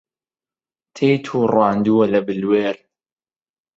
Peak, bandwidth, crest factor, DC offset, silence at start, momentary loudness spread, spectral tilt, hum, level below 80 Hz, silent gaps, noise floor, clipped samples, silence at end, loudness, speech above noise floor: -2 dBFS; 7.8 kHz; 18 dB; under 0.1%; 0.95 s; 5 LU; -7.5 dB/octave; none; -60 dBFS; none; under -90 dBFS; under 0.1%; 1 s; -18 LUFS; over 73 dB